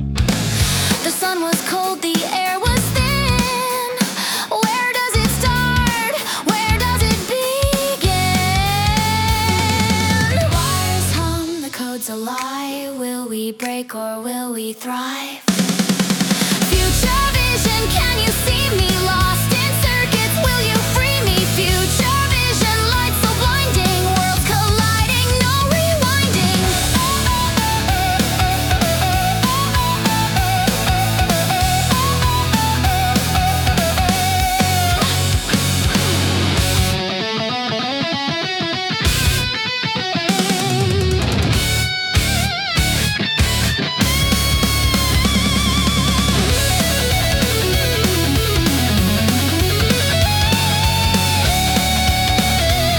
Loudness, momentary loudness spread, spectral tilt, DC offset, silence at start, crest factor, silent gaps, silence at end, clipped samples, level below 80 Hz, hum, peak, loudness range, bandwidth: -16 LUFS; 4 LU; -4 dB/octave; under 0.1%; 0 s; 14 dB; none; 0 s; under 0.1%; -26 dBFS; none; -2 dBFS; 3 LU; 19 kHz